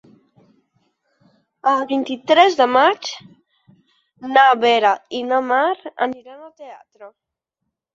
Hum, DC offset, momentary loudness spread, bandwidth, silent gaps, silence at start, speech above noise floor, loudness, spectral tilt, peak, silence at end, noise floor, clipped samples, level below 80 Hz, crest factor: none; under 0.1%; 20 LU; 7.6 kHz; none; 1.65 s; 62 dB; -17 LUFS; -3 dB/octave; -2 dBFS; 0.85 s; -79 dBFS; under 0.1%; -72 dBFS; 18 dB